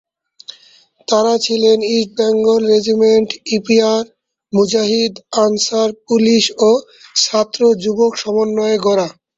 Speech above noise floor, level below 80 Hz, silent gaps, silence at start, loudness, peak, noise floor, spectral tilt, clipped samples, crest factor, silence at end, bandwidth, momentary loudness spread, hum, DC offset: 25 dB; -58 dBFS; none; 0.5 s; -14 LUFS; 0 dBFS; -39 dBFS; -3.5 dB/octave; under 0.1%; 14 dB; 0.25 s; 8 kHz; 7 LU; none; under 0.1%